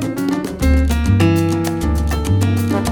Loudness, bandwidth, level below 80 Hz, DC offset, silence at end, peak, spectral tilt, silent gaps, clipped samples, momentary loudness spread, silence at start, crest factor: -17 LUFS; 18 kHz; -22 dBFS; under 0.1%; 0 s; -2 dBFS; -6.5 dB/octave; none; under 0.1%; 5 LU; 0 s; 14 dB